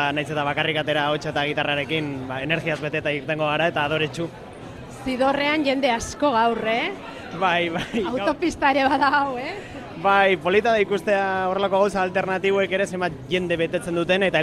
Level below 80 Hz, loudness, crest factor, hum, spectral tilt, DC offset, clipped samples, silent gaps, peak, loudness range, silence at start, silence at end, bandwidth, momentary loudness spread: -52 dBFS; -22 LUFS; 16 dB; none; -5 dB/octave; under 0.1%; under 0.1%; none; -6 dBFS; 3 LU; 0 s; 0 s; 13.5 kHz; 10 LU